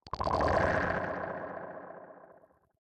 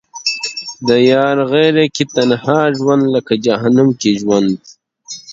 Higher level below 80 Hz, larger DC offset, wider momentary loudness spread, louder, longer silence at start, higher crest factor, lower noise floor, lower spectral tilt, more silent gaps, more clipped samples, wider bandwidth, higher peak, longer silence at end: first, -50 dBFS vs -56 dBFS; neither; first, 21 LU vs 9 LU; second, -32 LUFS vs -13 LUFS; about the same, 0.05 s vs 0.15 s; first, 20 dB vs 14 dB; first, -61 dBFS vs -34 dBFS; first, -6.5 dB/octave vs -5 dB/octave; neither; neither; first, 9.8 kHz vs 8 kHz; second, -14 dBFS vs 0 dBFS; first, 0.7 s vs 0 s